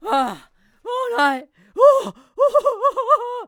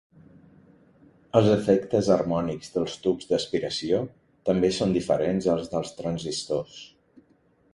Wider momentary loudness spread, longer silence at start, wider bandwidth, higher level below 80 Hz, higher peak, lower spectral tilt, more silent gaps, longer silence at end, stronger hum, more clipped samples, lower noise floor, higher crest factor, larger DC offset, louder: first, 18 LU vs 9 LU; second, 0.05 s vs 1.35 s; first, 16 kHz vs 11.5 kHz; second, -62 dBFS vs -56 dBFS; first, -2 dBFS vs -6 dBFS; second, -3.5 dB/octave vs -6 dB/octave; neither; second, 0 s vs 0.85 s; neither; neither; second, -49 dBFS vs -63 dBFS; about the same, 18 dB vs 20 dB; neither; first, -18 LUFS vs -25 LUFS